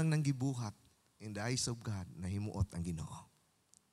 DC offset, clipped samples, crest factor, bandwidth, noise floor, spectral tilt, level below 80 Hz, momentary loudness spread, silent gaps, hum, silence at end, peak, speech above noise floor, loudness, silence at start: under 0.1%; under 0.1%; 16 dB; 14.5 kHz; -71 dBFS; -5 dB/octave; -58 dBFS; 12 LU; none; none; 0.65 s; -22 dBFS; 33 dB; -39 LUFS; 0 s